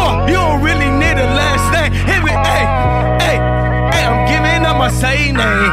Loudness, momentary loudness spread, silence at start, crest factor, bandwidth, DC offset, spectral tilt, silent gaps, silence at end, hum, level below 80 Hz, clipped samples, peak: -13 LUFS; 1 LU; 0 s; 12 dB; 15.5 kHz; 0.4%; -5 dB/octave; none; 0 s; none; -20 dBFS; under 0.1%; -2 dBFS